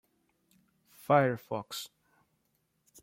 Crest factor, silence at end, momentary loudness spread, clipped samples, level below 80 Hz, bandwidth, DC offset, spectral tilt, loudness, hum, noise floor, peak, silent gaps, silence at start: 24 dB; 1.15 s; 21 LU; under 0.1%; -78 dBFS; 16.5 kHz; under 0.1%; -5.5 dB/octave; -30 LUFS; none; -77 dBFS; -10 dBFS; none; 1.1 s